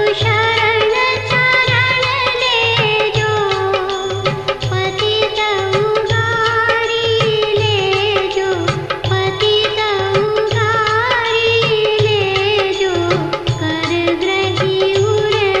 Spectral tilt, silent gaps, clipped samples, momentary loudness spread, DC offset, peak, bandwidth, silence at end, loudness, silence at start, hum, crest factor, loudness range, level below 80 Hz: -4.5 dB/octave; none; under 0.1%; 5 LU; under 0.1%; -2 dBFS; 11 kHz; 0 s; -14 LUFS; 0 s; none; 14 dB; 2 LU; -42 dBFS